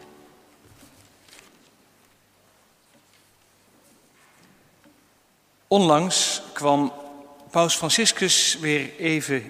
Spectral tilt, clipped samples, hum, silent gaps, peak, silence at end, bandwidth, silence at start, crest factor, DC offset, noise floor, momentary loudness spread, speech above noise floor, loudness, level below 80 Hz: -2.5 dB/octave; under 0.1%; none; none; -4 dBFS; 0 s; 15.5 kHz; 5.7 s; 22 dB; under 0.1%; -61 dBFS; 8 LU; 40 dB; -21 LUFS; -70 dBFS